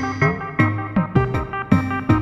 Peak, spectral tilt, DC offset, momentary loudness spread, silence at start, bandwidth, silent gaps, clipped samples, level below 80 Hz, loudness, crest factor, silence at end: -2 dBFS; -8 dB/octave; under 0.1%; 3 LU; 0 s; 11.5 kHz; none; under 0.1%; -36 dBFS; -20 LUFS; 18 dB; 0 s